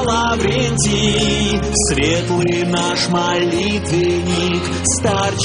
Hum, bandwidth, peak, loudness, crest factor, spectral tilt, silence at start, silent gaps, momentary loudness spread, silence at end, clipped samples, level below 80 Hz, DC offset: none; 11 kHz; -4 dBFS; -16 LUFS; 14 dB; -4 dB/octave; 0 s; none; 2 LU; 0 s; under 0.1%; -32 dBFS; under 0.1%